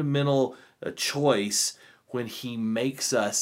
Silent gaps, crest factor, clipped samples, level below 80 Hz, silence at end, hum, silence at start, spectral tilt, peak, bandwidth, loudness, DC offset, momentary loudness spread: none; 18 dB; under 0.1%; -74 dBFS; 0 s; none; 0 s; -4 dB/octave; -8 dBFS; 16 kHz; -27 LUFS; under 0.1%; 11 LU